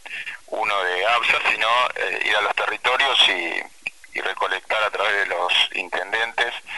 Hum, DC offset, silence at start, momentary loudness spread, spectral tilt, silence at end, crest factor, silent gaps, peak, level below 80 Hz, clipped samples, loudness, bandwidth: none; 0.4%; 0.05 s; 11 LU; -0.5 dB/octave; 0 s; 18 dB; none; -4 dBFS; -62 dBFS; under 0.1%; -20 LUFS; 11.5 kHz